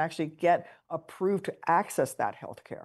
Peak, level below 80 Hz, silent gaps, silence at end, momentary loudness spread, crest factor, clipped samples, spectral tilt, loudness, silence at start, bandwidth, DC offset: -12 dBFS; -76 dBFS; none; 0 s; 13 LU; 18 dB; under 0.1%; -5.5 dB/octave; -30 LUFS; 0 s; 12.5 kHz; under 0.1%